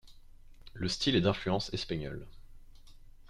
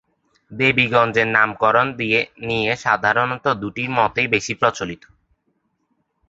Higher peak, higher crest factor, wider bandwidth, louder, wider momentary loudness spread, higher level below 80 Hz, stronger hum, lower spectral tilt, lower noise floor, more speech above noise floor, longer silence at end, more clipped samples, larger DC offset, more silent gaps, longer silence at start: second, -14 dBFS vs -2 dBFS; about the same, 20 dB vs 20 dB; first, 12.5 kHz vs 8 kHz; second, -32 LUFS vs -18 LUFS; first, 16 LU vs 7 LU; about the same, -52 dBFS vs -54 dBFS; neither; about the same, -5 dB/octave vs -4.5 dB/octave; second, -52 dBFS vs -69 dBFS; second, 20 dB vs 50 dB; second, 0 s vs 1.35 s; neither; neither; neither; second, 0.05 s vs 0.5 s